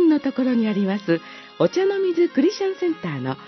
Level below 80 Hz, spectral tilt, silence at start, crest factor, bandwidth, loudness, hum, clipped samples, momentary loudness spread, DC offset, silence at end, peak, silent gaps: -70 dBFS; -7 dB/octave; 0 s; 16 dB; 6.2 kHz; -21 LUFS; none; under 0.1%; 6 LU; under 0.1%; 0 s; -4 dBFS; none